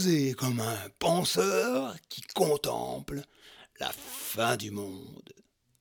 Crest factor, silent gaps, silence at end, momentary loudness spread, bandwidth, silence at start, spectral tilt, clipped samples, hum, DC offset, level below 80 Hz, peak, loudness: 20 dB; none; 0.5 s; 15 LU; over 20 kHz; 0 s; -4.5 dB/octave; under 0.1%; none; under 0.1%; -62 dBFS; -12 dBFS; -30 LUFS